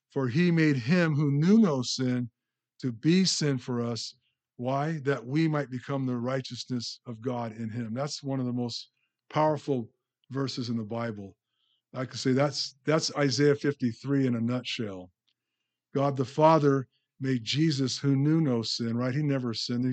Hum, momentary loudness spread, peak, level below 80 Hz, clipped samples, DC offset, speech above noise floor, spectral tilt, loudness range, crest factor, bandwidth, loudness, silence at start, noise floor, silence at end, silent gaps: none; 13 LU; -8 dBFS; -76 dBFS; under 0.1%; under 0.1%; 58 dB; -6 dB/octave; 6 LU; 20 dB; 9 kHz; -28 LUFS; 0.15 s; -86 dBFS; 0 s; none